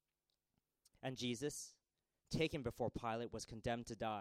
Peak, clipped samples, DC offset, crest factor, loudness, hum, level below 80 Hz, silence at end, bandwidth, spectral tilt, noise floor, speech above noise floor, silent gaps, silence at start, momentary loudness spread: -26 dBFS; under 0.1%; under 0.1%; 20 dB; -45 LUFS; none; -64 dBFS; 0 s; 16 kHz; -4.5 dB/octave; under -90 dBFS; over 46 dB; none; 1.05 s; 8 LU